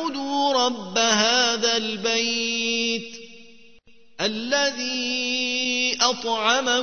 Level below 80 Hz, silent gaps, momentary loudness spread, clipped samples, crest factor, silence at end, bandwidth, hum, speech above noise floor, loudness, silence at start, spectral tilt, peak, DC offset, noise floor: -64 dBFS; none; 8 LU; under 0.1%; 20 dB; 0 s; 6.6 kHz; none; 31 dB; -21 LUFS; 0 s; -1 dB/octave; -4 dBFS; 0.4%; -54 dBFS